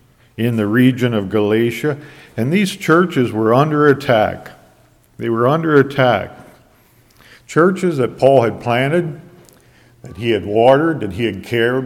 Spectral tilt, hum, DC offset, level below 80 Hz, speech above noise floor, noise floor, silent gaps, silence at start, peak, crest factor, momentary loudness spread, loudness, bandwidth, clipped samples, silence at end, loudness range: -7 dB/octave; none; under 0.1%; -52 dBFS; 36 dB; -51 dBFS; none; 0.4 s; 0 dBFS; 16 dB; 10 LU; -15 LUFS; 16.5 kHz; under 0.1%; 0 s; 2 LU